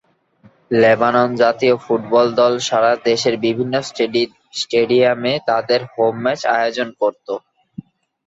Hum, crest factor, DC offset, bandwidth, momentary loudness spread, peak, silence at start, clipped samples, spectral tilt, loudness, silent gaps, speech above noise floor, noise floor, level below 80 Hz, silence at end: none; 16 dB; under 0.1%; 8 kHz; 7 LU; -2 dBFS; 0.7 s; under 0.1%; -4.5 dB/octave; -17 LUFS; none; 36 dB; -52 dBFS; -62 dBFS; 0.9 s